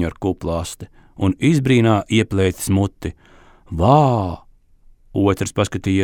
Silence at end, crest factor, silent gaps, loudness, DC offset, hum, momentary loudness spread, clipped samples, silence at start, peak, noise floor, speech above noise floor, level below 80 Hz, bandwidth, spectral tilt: 0 s; 18 dB; none; -18 LUFS; under 0.1%; none; 17 LU; under 0.1%; 0 s; -2 dBFS; -49 dBFS; 32 dB; -40 dBFS; 18 kHz; -6.5 dB/octave